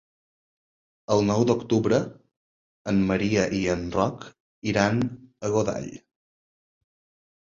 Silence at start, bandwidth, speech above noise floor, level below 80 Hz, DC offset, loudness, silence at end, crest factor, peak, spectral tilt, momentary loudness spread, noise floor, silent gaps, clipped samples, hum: 1.1 s; 7.6 kHz; over 66 dB; -52 dBFS; under 0.1%; -25 LUFS; 1.5 s; 22 dB; -4 dBFS; -6 dB/octave; 13 LU; under -90 dBFS; 2.36-2.85 s, 4.40-4.62 s; under 0.1%; none